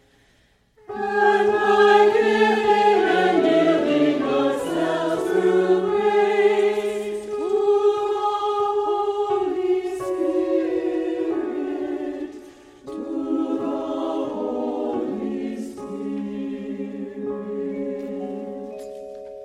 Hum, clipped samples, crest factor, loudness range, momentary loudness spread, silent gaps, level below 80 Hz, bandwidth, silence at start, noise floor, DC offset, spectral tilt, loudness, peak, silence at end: none; under 0.1%; 18 dB; 11 LU; 14 LU; none; -60 dBFS; 12 kHz; 0.9 s; -60 dBFS; under 0.1%; -5.5 dB/octave; -21 LUFS; -4 dBFS; 0 s